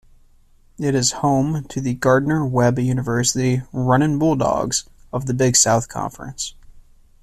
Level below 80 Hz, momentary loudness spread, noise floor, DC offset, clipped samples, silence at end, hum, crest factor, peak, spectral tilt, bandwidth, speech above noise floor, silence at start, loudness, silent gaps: -44 dBFS; 12 LU; -52 dBFS; under 0.1%; under 0.1%; 0.4 s; none; 16 dB; -2 dBFS; -4.5 dB/octave; 14 kHz; 33 dB; 0.8 s; -19 LUFS; none